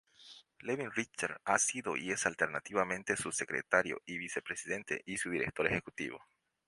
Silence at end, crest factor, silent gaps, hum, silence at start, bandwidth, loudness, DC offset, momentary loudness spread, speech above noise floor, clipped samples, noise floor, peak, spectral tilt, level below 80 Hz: 0.5 s; 26 dB; none; none; 0.2 s; 11.5 kHz; -35 LUFS; under 0.1%; 11 LU; 22 dB; under 0.1%; -58 dBFS; -12 dBFS; -3 dB/octave; -68 dBFS